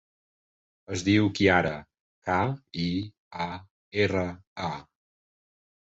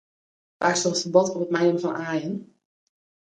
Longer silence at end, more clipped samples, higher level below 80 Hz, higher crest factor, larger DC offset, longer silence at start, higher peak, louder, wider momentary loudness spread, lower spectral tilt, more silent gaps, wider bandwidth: first, 1.1 s vs 0.85 s; neither; first, -50 dBFS vs -72 dBFS; about the same, 22 dB vs 22 dB; neither; first, 0.9 s vs 0.6 s; second, -8 dBFS vs -4 dBFS; second, -27 LUFS vs -23 LUFS; first, 16 LU vs 8 LU; first, -5.5 dB/octave vs -4 dB/octave; first, 2.00-2.22 s, 3.18-3.31 s, 3.70-3.91 s, 4.47-4.56 s vs none; second, 8 kHz vs 10 kHz